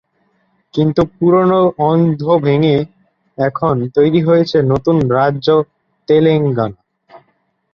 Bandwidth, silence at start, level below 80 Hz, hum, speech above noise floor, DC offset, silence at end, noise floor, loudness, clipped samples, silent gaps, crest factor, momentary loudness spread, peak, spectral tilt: 6.6 kHz; 0.75 s; -48 dBFS; none; 49 dB; under 0.1%; 0.55 s; -62 dBFS; -14 LUFS; under 0.1%; none; 14 dB; 8 LU; 0 dBFS; -9 dB/octave